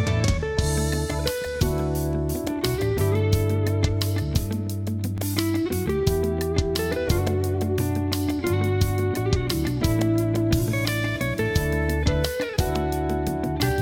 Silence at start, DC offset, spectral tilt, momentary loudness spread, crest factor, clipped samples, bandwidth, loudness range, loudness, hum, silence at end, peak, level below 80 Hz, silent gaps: 0 s; under 0.1%; -6 dB/octave; 3 LU; 16 dB; under 0.1%; 18.5 kHz; 1 LU; -24 LUFS; none; 0 s; -8 dBFS; -34 dBFS; none